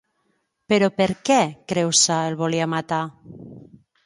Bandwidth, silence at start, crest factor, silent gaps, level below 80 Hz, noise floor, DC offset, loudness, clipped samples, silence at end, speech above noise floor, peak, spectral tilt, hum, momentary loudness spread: 11.5 kHz; 0.7 s; 18 dB; none; -60 dBFS; -70 dBFS; under 0.1%; -20 LUFS; under 0.1%; 0.4 s; 49 dB; -4 dBFS; -3.5 dB/octave; none; 11 LU